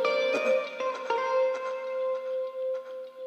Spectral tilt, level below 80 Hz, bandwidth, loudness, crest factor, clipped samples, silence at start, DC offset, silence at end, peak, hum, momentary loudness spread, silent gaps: -2.5 dB/octave; -82 dBFS; 8.4 kHz; -29 LUFS; 16 dB; under 0.1%; 0 s; under 0.1%; 0 s; -14 dBFS; none; 8 LU; none